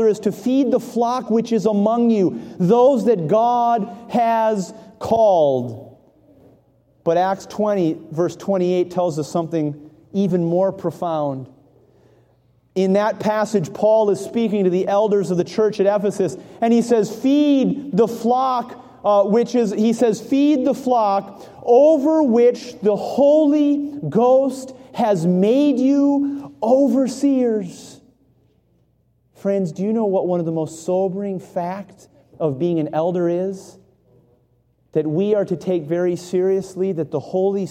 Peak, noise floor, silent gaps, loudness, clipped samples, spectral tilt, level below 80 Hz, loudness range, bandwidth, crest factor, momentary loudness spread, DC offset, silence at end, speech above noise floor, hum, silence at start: -4 dBFS; -61 dBFS; none; -19 LUFS; under 0.1%; -7 dB/octave; -64 dBFS; 6 LU; 15.5 kHz; 16 dB; 10 LU; under 0.1%; 0 s; 44 dB; none; 0 s